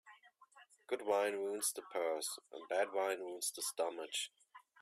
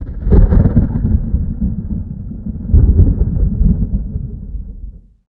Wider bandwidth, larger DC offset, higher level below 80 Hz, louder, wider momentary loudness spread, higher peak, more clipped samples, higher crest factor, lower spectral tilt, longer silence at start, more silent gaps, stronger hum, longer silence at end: first, 16 kHz vs 2.1 kHz; neither; second, under -90 dBFS vs -16 dBFS; second, -39 LUFS vs -15 LUFS; second, 7 LU vs 16 LU; second, -22 dBFS vs 0 dBFS; neither; about the same, 18 dB vs 14 dB; second, -0.5 dB/octave vs -14 dB/octave; about the same, 0.05 s vs 0 s; neither; neither; about the same, 0.25 s vs 0.3 s